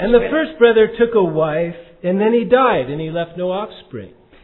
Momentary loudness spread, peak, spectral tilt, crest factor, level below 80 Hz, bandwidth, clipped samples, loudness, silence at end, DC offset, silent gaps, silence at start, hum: 13 LU; 0 dBFS; -10 dB/octave; 16 dB; -42 dBFS; 4.2 kHz; under 0.1%; -16 LUFS; 0.35 s; under 0.1%; none; 0 s; none